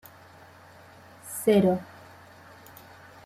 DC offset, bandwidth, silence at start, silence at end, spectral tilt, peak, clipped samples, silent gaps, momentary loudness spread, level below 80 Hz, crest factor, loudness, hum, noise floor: under 0.1%; 15.5 kHz; 1.25 s; 1.4 s; -6 dB/octave; -10 dBFS; under 0.1%; none; 28 LU; -68 dBFS; 20 dB; -25 LUFS; none; -51 dBFS